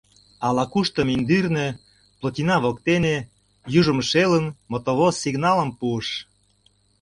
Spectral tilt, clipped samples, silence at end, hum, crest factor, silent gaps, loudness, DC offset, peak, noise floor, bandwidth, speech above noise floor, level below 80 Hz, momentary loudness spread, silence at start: -5.5 dB/octave; under 0.1%; 0.8 s; 50 Hz at -55 dBFS; 18 dB; none; -22 LUFS; under 0.1%; -4 dBFS; -62 dBFS; 11.5 kHz; 41 dB; -52 dBFS; 10 LU; 0.4 s